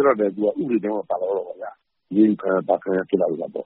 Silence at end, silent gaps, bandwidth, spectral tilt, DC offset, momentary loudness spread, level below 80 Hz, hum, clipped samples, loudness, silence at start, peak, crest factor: 0 s; none; 4 kHz; -7 dB/octave; under 0.1%; 9 LU; -68 dBFS; none; under 0.1%; -22 LUFS; 0 s; -4 dBFS; 18 dB